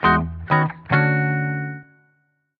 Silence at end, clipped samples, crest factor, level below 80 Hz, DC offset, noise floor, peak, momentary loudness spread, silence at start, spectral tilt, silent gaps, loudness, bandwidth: 0.75 s; under 0.1%; 20 dB; -42 dBFS; under 0.1%; -67 dBFS; -2 dBFS; 11 LU; 0 s; -9.5 dB/octave; none; -20 LUFS; 4.9 kHz